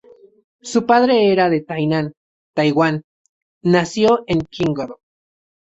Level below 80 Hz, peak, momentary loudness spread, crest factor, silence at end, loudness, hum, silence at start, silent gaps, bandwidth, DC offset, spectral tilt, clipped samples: -54 dBFS; -2 dBFS; 13 LU; 16 dB; 0.85 s; -17 LUFS; none; 0.65 s; 2.17-2.54 s, 3.04-3.61 s; 8.2 kHz; under 0.1%; -6 dB/octave; under 0.1%